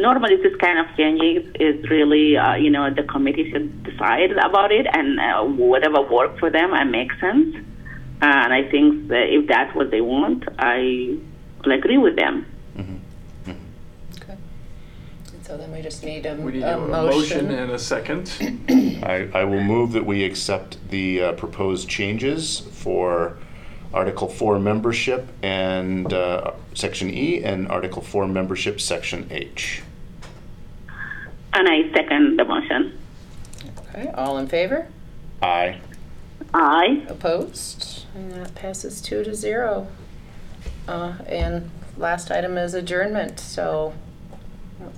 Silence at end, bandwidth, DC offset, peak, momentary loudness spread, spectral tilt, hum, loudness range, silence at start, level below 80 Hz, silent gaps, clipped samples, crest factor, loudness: 0 s; 14 kHz; under 0.1%; -4 dBFS; 19 LU; -5 dB/octave; none; 10 LU; 0 s; -42 dBFS; none; under 0.1%; 18 dB; -20 LUFS